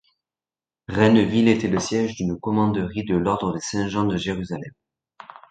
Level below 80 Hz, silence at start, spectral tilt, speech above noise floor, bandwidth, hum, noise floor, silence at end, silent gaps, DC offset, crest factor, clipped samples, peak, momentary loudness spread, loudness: -48 dBFS; 0.9 s; -6 dB/octave; over 69 dB; 9.2 kHz; none; under -90 dBFS; 0.25 s; none; under 0.1%; 20 dB; under 0.1%; -2 dBFS; 12 LU; -22 LUFS